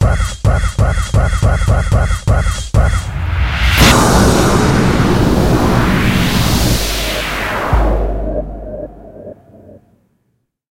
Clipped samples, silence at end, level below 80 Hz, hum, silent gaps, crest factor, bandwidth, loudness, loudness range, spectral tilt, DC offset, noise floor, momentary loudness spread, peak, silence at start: under 0.1%; 1 s; -18 dBFS; none; none; 12 dB; 16.5 kHz; -13 LUFS; 8 LU; -5 dB/octave; under 0.1%; -64 dBFS; 12 LU; 0 dBFS; 0 s